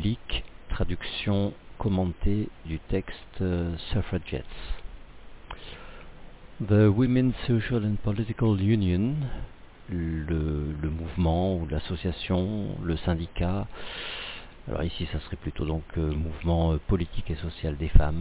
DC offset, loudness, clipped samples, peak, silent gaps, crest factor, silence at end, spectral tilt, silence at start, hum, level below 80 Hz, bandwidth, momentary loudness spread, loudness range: under 0.1%; -29 LUFS; under 0.1%; -4 dBFS; none; 24 dB; 0 s; -11.5 dB/octave; 0 s; none; -34 dBFS; 4 kHz; 15 LU; 7 LU